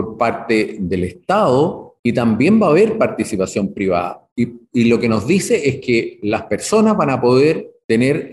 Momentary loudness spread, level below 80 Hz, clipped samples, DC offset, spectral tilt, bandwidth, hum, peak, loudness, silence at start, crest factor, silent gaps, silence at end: 8 LU; -50 dBFS; under 0.1%; under 0.1%; -6 dB/octave; 12.5 kHz; none; -4 dBFS; -16 LUFS; 0 s; 12 dB; 1.99-2.04 s, 4.32-4.36 s, 7.84-7.89 s; 0 s